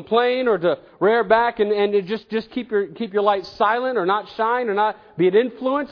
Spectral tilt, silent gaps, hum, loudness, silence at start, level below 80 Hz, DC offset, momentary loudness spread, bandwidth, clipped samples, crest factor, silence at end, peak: -7.5 dB/octave; none; none; -20 LUFS; 0 s; -60 dBFS; under 0.1%; 7 LU; 5.4 kHz; under 0.1%; 16 dB; 0.05 s; -4 dBFS